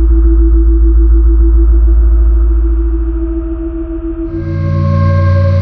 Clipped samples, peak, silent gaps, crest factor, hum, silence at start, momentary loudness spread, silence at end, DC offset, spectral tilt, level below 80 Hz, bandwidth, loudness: under 0.1%; 0 dBFS; none; 8 dB; none; 0 s; 9 LU; 0 s; under 0.1%; -10 dB/octave; -10 dBFS; 2.4 kHz; -12 LUFS